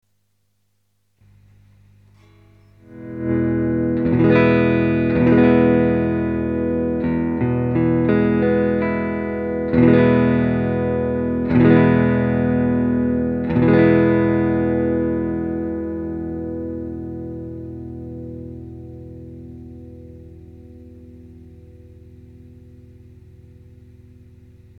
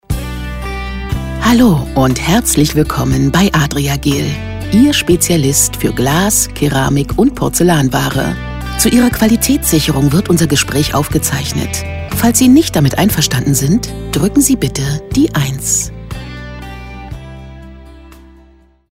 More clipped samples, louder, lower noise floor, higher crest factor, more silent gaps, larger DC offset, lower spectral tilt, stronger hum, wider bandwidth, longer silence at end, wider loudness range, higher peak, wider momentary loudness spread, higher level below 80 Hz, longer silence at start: neither; second, -18 LUFS vs -12 LUFS; first, -69 dBFS vs -46 dBFS; first, 18 dB vs 12 dB; neither; neither; first, -11 dB/octave vs -4.5 dB/octave; first, 50 Hz at -50 dBFS vs none; second, 4.9 kHz vs 16.5 kHz; first, 2.5 s vs 0.7 s; first, 17 LU vs 4 LU; about the same, -2 dBFS vs 0 dBFS; first, 21 LU vs 12 LU; second, -40 dBFS vs -26 dBFS; first, 2.9 s vs 0.1 s